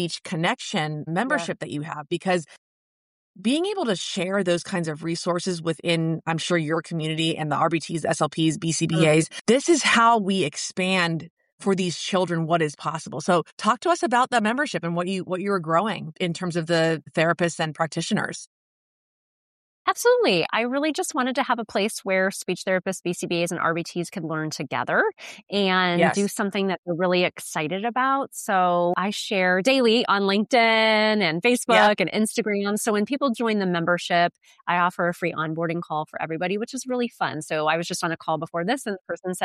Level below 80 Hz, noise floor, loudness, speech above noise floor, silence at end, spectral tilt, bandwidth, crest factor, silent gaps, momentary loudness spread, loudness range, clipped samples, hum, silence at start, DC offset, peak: -70 dBFS; under -90 dBFS; -23 LUFS; over 67 dB; 0 s; -4.5 dB/octave; 14 kHz; 18 dB; 2.58-3.34 s, 9.41-9.45 s, 11.30-11.37 s, 11.52-11.58 s, 13.52-13.57 s, 18.47-19.85 s, 26.78-26.83 s; 9 LU; 6 LU; under 0.1%; none; 0 s; under 0.1%; -6 dBFS